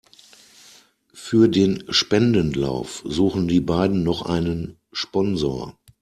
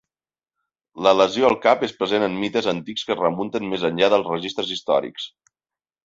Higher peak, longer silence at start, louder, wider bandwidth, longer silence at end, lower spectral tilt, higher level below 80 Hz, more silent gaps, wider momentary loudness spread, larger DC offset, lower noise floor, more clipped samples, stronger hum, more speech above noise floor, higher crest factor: about the same, -4 dBFS vs -2 dBFS; first, 1.15 s vs 0.95 s; about the same, -21 LUFS vs -21 LUFS; first, 13 kHz vs 7.8 kHz; second, 0.3 s vs 0.75 s; about the same, -6 dB/octave vs -5 dB/octave; first, -46 dBFS vs -62 dBFS; neither; first, 12 LU vs 9 LU; neither; second, -52 dBFS vs under -90 dBFS; neither; neither; second, 32 dB vs over 69 dB; about the same, 18 dB vs 20 dB